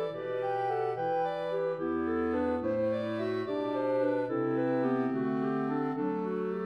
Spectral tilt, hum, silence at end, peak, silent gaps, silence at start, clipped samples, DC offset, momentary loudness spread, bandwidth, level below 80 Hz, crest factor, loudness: -8.5 dB/octave; none; 0 s; -18 dBFS; none; 0 s; under 0.1%; under 0.1%; 3 LU; 6.2 kHz; -64 dBFS; 12 dB; -31 LUFS